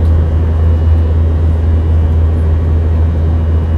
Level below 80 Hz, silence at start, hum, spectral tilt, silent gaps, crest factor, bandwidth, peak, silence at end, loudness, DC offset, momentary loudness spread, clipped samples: -16 dBFS; 0 s; none; -10 dB/octave; none; 8 dB; 3.4 kHz; -2 dBFS; 0 s; -12 LUFS; under 0.1%; 1 LU; under 0.1%